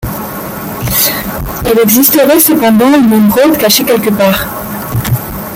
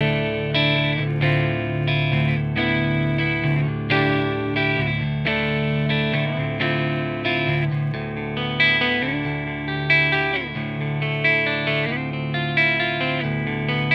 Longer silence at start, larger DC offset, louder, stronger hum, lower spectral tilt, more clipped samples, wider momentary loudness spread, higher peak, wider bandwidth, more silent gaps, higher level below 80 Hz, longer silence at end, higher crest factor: about the same, 0 s vs 0 s; neither; first, -8 LUFS vs -21 LUFS; neither; second, -4.5 dB/octave vs -8 dB/octave; first, 0.2% vs under 0.1%; first, 13 LU vs 7 LU; first, 0 dBFS vs -6 dBFS; first, over 20 kHz vs 5.8 kHz; neither; first, -30 dBFS vs -44 dBFS; about the same, 0 s vs 0 s; second, 10 dB vs 16 dB